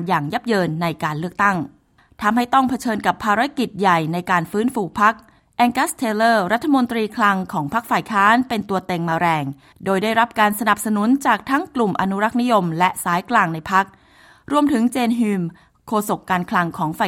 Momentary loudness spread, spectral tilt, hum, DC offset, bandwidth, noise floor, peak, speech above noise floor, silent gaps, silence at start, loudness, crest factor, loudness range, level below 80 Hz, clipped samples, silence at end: 6 LU; -5 dB/octave; none; under 0.1%; 16.5 kHz; -45 dBFS; -2 dBFS; 26 dB; none; 0 s; -19 LUFS; 18 dB; 2 LU; -56 dBFS; under 0.1%; 0 s